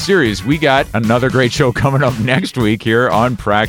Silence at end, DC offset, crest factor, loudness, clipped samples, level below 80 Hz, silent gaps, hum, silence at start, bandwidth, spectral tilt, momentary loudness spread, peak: 0 s; under 0.1%; 14 dB; -14 LUFS; under 0.1%; -36 dBFS; none; none; 0 s; 17 kHz; -6 dB/octave; 3 LU; 0 dBFS